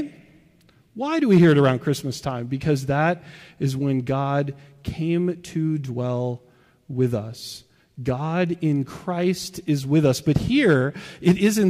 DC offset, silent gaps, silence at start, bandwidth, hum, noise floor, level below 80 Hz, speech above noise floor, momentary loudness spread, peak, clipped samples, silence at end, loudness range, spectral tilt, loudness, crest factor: under 0.1%; none; 0 s; 15.5 kHz; none; -57 dBFS; -50 dBFS; 35 dB; 13 LU; -8 dBFS; under 0.1%; 0 s; 6 LU; -6.5 dB/octave; -22 LUFS; 16 dB